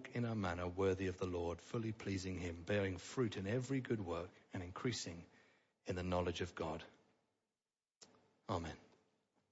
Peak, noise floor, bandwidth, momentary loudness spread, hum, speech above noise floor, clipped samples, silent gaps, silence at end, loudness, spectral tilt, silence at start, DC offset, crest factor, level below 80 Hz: -26 dBFS; under -90 dBFS; 7.6 kHz; 11 LU; none; over 48 dB; under 0.1%; 7.96-8.00 s; 0.7 s; -43 LUFS; -5.5 dB/octave; 0 s; under 0.1%; 16 dB; -66 dBFS